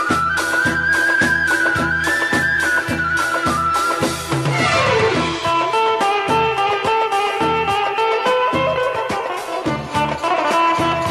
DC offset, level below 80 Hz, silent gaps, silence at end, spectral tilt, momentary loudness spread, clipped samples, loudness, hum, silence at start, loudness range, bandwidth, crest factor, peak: under 0.1%; -44 dBFS; none; 0 s; -4 dB/octave; 5 LU; under 0.1%; -17 LUFS; none; 0 s; 2 LU; 13.5 kHz; 14 dB; -4 dBFS